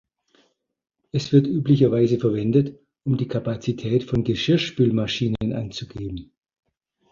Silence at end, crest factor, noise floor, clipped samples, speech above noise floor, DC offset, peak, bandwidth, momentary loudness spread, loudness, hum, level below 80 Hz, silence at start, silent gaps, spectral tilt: 0.9 s; 18 dB; -65 dBFS; under 0.1%; 44 dB; under 0.1%; -6 dBFS; 7.4 kHz; 14 LU; -22 LUFS; none; -50 dBFS; 1.15 s; none; -7.5 dB/octave